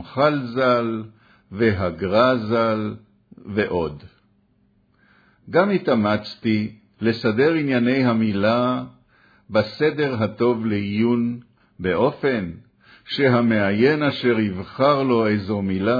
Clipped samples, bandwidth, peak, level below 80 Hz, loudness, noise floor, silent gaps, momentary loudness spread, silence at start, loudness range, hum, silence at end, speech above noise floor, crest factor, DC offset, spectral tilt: under 0.1%; 5 kHz; -4 dBFS; -56 dBFS; -21 LUFS; -62 dBFS; none; 10 LU; 0 s; 4 LU; none; 0 s; 42 dB; 18 dB; under 0.1%; -8.5 dB/octave